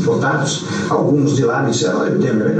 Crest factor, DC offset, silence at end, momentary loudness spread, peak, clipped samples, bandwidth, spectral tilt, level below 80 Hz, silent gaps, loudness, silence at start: 12 dB; under 0.1%; 0 s; 4 LU; -4 dBFS; under 0.1%; 9.2 kHz; -5.5 dB/octave; -58 dBFS; none; -16 LUFS; 0 s